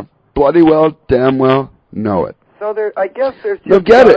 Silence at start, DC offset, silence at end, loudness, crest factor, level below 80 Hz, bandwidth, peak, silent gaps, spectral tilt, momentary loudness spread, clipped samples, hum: 0 s; under 0.1%; 0 s; -13 LUFS; 12 dB; -38 dBFS; 8 kHz; 0 dBFS; none; -7.5 dB/octave; 14 LU; 1%; none